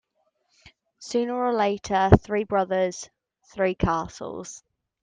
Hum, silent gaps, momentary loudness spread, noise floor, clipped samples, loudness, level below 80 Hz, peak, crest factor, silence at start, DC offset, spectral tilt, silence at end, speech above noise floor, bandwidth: none; none; 22 LU; -72 dBFS; under 0.1%; -24 LUFS; -42 dBFS; 0 dBFS; 26 dB; 1 s; under 0.1%; -6.5 dB/octave; 0.45 s; 48 dB; 9.6 kHz